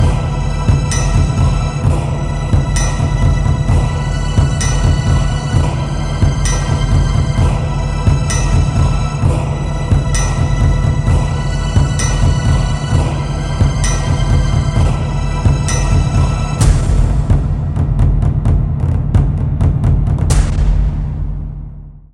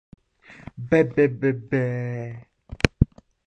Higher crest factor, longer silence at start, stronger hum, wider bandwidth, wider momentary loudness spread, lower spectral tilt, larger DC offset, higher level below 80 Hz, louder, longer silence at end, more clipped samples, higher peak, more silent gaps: second, 12 dB vs 22 dB; second, 0 s vs 0.5 s; neither; about the same, 11.5 kHz vs 11 kHz; second, 4 LU vs 20 LU; about the same, -6 dB/octave vs -7 dB/octave; neither; first, -16 dBFS vs -38 dBFS; first, -15 LUFS vs -23 LUFS; second, 0.15 s vs 0.45 s; neither; about the same, 0 dBFS vs -2 dBFS; neither